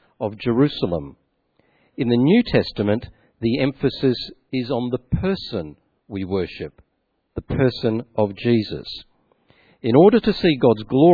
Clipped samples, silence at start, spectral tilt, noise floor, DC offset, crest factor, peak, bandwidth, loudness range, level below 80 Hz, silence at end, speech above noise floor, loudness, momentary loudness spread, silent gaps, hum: under 0.1%; 0.2 s; -9 dB/octave; -71 dBFS; under 0.1%; 20 dB; 0 dBFS; 4.9 kHz; 6 LU; -44 dBFS; 0 s; 52 dB; -20 LUFS; 15 LU; none; none